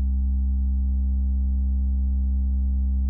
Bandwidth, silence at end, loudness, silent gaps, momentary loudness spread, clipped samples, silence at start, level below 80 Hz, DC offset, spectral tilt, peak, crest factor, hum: 0.8 kHz; 0 s; -25 LUFS; none; 0 LU; under 0.1%; 0 s; -22 dBFS; under 0.1%; -17.5 dB/octave; -16 dBFS; 4 dB; none